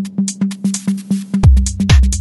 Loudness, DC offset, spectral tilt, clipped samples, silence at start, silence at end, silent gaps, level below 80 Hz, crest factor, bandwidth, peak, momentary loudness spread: -15 LUFS; under 0.1%; -5.5 dB/octave; under 0.1%; 0 s; 0 s; none; -16 dBFS; 14 dB; 12 kHz; 0 dBFS; 8 LU